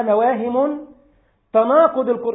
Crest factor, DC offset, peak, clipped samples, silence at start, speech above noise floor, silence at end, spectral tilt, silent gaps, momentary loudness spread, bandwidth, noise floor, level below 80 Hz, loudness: 16 dB; under 0.1%; -2 dBFS; under 0.1%; 0 s; 41 dB; 0 s; -11 dB/octave; none; 7 LU; 3.9 kHz; -58 dBFS; -62 dBFS; -17 LUFS